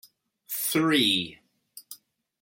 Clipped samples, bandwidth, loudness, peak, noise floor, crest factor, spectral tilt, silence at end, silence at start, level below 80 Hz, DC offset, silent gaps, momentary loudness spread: under 0.1%; 17 kHz; -24 LUFS; -10 dBFS; -53 dBFS; 20 dB; -3 dB/octave; 0.45 s; 0.5 s; -72 dBFS; under 0.1%; none; 24 LU